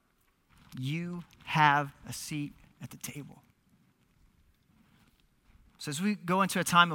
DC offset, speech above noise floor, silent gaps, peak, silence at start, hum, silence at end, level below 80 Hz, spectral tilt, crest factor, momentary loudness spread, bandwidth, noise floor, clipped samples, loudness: under 0.1%; 41 dB; none; -8 dBFS; 0.7 s; none; 0 s; -66 dBFS; -4 dB/octave; 26 dB; 22 LU; 17.5 kHz; -71 dBFS; under 0.1%; -31 LUFS